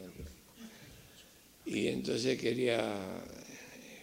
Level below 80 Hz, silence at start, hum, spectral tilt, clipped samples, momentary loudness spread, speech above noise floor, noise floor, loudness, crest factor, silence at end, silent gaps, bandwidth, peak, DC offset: -64 dBFS; 0 s; none; -4.5 dB/octave; under 0.1%; 22 LU; 25 dB; -59 dBFS; -35 LUFS; 20 dB; 0 s; none; 16 kHz; -18 dBFS; under 0.1%